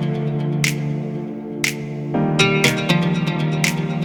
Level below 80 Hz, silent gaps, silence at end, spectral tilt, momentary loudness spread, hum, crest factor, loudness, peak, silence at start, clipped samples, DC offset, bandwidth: -52 dBFS; none; 0 s; -5 dB/octave; 10 LU; none; 20 dB; -20 LUFS; 0 dBFS; 0 s; under 0.1%; under 0.1%; 19 kHz